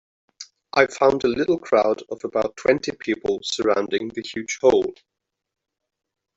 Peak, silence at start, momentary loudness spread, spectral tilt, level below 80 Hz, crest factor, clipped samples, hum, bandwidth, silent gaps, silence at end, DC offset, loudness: -2 dBFS; 0.4 s; 11 LU; -4 dB/octave; -58 dBFS; 20 dB; under 0.1%; none; 8 kHz; none; 1.45 s; under 0.1%; -22 LUFS